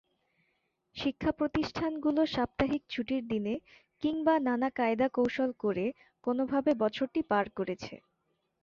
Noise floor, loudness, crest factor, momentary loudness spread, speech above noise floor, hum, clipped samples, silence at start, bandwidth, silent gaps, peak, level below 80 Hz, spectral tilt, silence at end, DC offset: -79 dBFS; -31 LUFS; 18 dB; 8 LU; 48 dB; none; under 0.1%; 0.95 s; 7.2 kHz; none; -14 dBFS; -58 dBFS; -6.5 dB/octave; 0.65 s; under 0.1%